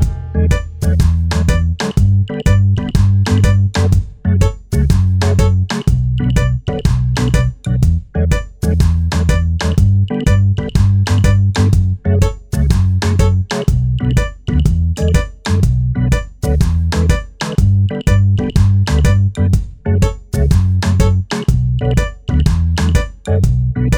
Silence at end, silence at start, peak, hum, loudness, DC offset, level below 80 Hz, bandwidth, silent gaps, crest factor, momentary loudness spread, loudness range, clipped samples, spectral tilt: 0 s; 0 s; 0 dBFS; none; -15 LUFS; 0.7%; -18 dBFS; 13.5 kHz; none; 12 dB; 5 LU; 2 LU; under 0.1%; -6.5 dB/octave